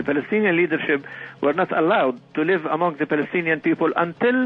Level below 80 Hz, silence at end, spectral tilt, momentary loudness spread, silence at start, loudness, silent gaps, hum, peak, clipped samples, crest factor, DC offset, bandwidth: -68 dBFS; 0 s; -8.5 dB/octave; 5 LU; 0 s; -21 LUFS; none; none; -6 dBFS; under 0.1%; 16 dB; under 0.1%; 5.2 kHz